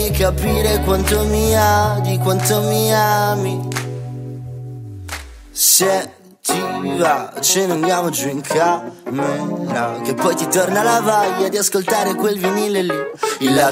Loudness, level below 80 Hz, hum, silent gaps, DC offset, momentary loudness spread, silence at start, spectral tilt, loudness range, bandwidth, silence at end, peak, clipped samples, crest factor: -17 LUFS; -32 dBFS; none; none; under 0.1%; 14 LU; 0 s; -4 dB/octave; 3 LU; 16.5 kHz; 0 s; 0 dBFS; under 0.1%; 18 dB